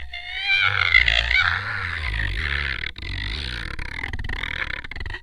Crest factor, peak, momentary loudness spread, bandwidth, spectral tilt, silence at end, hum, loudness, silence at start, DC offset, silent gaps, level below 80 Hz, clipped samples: 24 dB; 0 dBFS; 15 LU; 11.5 kHz; -3.5 dB/octave; 0 s; none; -22 LUFS; 0 s; under 0.1%; none; -32 dBFS; under 0.1%